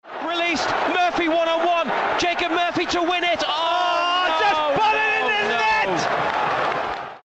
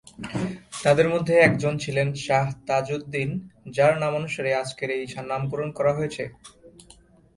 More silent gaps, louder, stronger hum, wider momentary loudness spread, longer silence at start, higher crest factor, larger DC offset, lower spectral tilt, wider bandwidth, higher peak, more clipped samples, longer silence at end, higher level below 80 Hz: neither; first, -20 LUFS vs -24 LUFS; neither; second, 3 LU vs 11 LU; second, 0.05 s vs 0.2 s; second, 12 dB vs 22 dB; neither; second, -3 dB/octave vs -6 dB/octave; second, 8.4 kHz vs 11.5 kHz; second, -10 dBFS vs -4 dBFS; neither; second, 0.05 s vs 0.65 s; about the same, -54 dBFS vs -56 dBFS